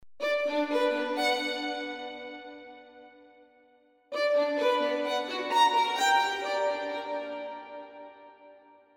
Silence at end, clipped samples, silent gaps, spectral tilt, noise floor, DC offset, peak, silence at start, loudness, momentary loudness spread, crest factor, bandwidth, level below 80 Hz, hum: 0.4 s; under 0.1%; none; -1 dB/octave; -63 dBFS; under 0.1%; -12 dBFS; 0 s; -28 LUFS; 20 LU; 18 dB; 18 kHz; -78 dBFS; none